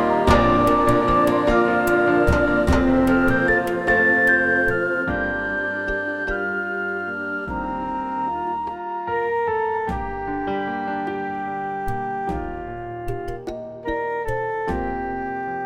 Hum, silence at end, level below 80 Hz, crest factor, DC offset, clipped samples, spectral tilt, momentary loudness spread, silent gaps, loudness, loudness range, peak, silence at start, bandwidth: none; 0 s; -34 dBFS; 18 dB; under 0.1%; under 0.1%; -6.5 dB/octave; 11 LU; none; -21 LUFS; 10 LU; -4 dBFS; 0 s; 17 kHz